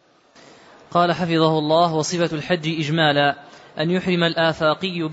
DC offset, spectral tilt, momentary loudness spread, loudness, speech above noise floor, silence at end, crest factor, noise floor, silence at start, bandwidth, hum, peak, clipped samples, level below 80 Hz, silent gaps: under 0.1%; -5 dB/octave; 6 LU; -20 LUFS; 31 dB; 0 s; 16 dB; -51 dBFS; 0.9 s; 8 kHz; none; -4 dBFS; under 0.1%; -60 dBFS; none